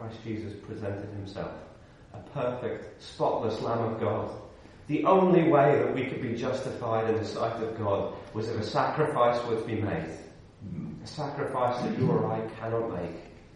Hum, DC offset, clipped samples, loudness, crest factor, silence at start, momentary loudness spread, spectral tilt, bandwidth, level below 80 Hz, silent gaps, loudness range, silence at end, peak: none; under 0.1%; under 0.1%; -29 LUFS; 20 dB; 0 s; 17 LU; -7.5 dB/octave; 11 kHz; -58 dBFS; none; 7 LU; 0.05 s; -8 dBFS